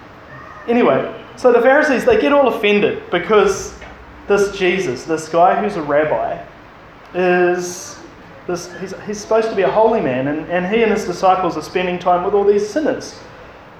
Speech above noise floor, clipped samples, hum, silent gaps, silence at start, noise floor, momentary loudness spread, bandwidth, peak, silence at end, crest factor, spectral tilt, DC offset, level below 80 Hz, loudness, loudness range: 24 dB; under 0.1%; none; none; 0 s; -40 dBFS; 17 LU; 13.5 kHz; 0 dBFS; 0.1 s; 16 dB; -5 dB/octave; under 0.1%; -48 dBFS; -16 LUFS; 5 LU